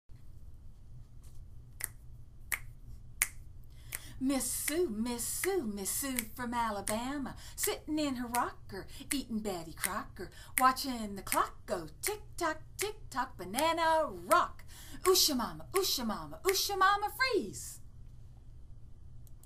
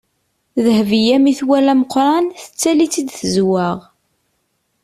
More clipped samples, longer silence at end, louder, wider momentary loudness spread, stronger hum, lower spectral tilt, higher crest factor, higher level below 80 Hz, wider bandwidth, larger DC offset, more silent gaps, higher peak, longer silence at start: neither; second, 0 s vs 1.05 s; second, -33 LUFS vs -15 LUFS; first, 15 LU vs 8 LU; neither; second, -2.5 dB/octave vs -5 dB/octave; first, 28 dB vs 12 dB; about the same, -52 dBFS vs -56 dBFS; first, 15.5 kHz vs 14 kHz; neither; neither; about the same, -6 dBFS vs -4 dBFS; second, 0.1 s vs 0.55 s